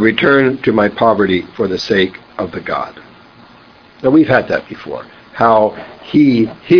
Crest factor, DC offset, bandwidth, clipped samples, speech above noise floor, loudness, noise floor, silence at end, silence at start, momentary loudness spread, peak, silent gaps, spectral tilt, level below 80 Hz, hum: 14 dB; under 0.1%; 5.4 kHz; under 0.1%; 30 dB; -14 LUFS; -43 dBFS; 0 s; 0 s; 16 LU; 0 dBFS; none; -7 dB/octave; -48 dBFS; none